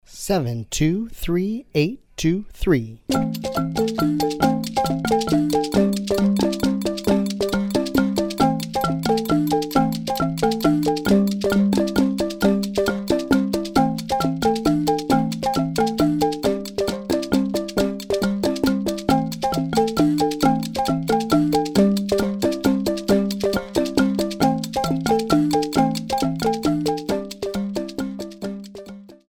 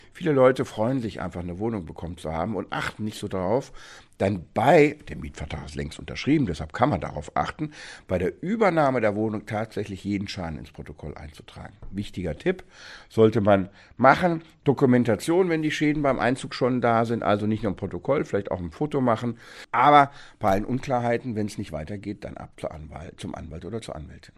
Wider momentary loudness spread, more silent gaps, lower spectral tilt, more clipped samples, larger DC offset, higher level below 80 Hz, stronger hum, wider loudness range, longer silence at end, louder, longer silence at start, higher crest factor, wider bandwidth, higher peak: second, 6 LU vs 18 LU; neither; about the same, -6 dB/octave vs -6.5 dB/octave; neither; neither; first, -42 dBFS vs -48 dBFS; neither; second, 2 LU vs 8 LU; about the same, 0.15 s vs 0.1 s; first, -21 LUFS vs -24 LUFS; about the same, 0.1 s vs 0.15 s; second, 18 dB vs 24 dB; first, 19.5 kHz vs 13 kHz; about the same, -2 dBFS vs -2 dBFS